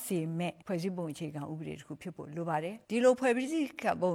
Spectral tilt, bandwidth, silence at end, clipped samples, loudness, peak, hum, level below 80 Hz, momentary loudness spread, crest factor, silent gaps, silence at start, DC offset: -6 dB/octave; 16.5 kHz; 0 s; under 0.1%; -33 LUFS; -14 dBFS; none; -72 dBFS; 15 LU; 20 dB; none; 0 s; under 0.1%